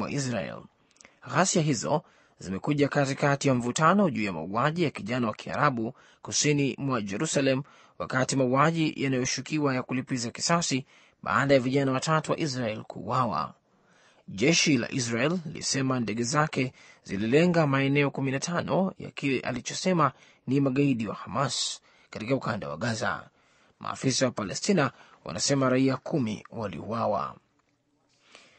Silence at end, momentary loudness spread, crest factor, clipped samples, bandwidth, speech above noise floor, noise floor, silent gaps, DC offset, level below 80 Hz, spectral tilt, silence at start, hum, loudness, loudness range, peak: 1.25 s; 11 LU; 20 dB; under 0.1%; 8.8 kHz; 44 dB; -71 dBFS; none; under 0.1%; -64 dBFS; -4.5 dB/octave; 0 s; none; -27 LUFS; 3 LU; -6 dBFS